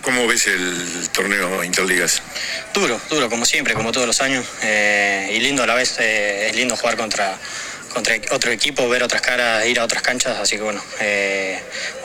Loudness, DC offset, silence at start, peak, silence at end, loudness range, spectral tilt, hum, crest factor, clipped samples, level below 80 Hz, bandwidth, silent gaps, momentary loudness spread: -18 LUFS; under 0.1%; 0 s; 0 dBFS; 0 s; 2 LU; -1.5 dB/octave; none; 20 dB; under 0.1%; -50 dBFS; 18 kHz; none; 7 LU